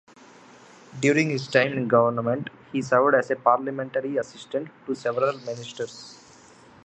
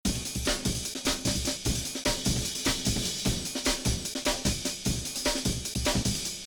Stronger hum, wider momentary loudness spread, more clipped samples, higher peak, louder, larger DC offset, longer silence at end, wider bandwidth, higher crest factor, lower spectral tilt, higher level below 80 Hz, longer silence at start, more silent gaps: neither; first, 14 LU vs 3 LU; neither; first, -2 dBFS vs -12 dBFS; first, -24 LUFS vs -29 LUFS; neither; first, 0.7 s vs 0 s; second, 8.8 kHz vs over 20 kHz; about the same, 22 dB vs 18 dB; first, -5.5 dB/octave vs -3 dB/octave; second, -70 dBFS vs -38 dBFS; first, 0.9 s vs 0.05 s; neither